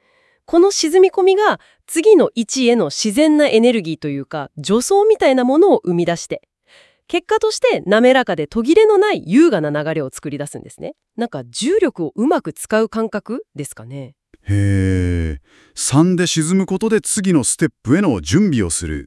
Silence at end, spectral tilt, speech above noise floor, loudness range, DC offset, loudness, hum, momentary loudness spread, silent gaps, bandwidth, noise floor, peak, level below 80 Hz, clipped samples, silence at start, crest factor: 0 s; -5 dB/octave; 36 dB; 6 LU; under 0.1%; -16 LUFS; none; 15 LU; none; 12 kHz; -51 dBFS; 0 dBFS; -44 dBFS; under 0.1%; 0.5 s; 16 dB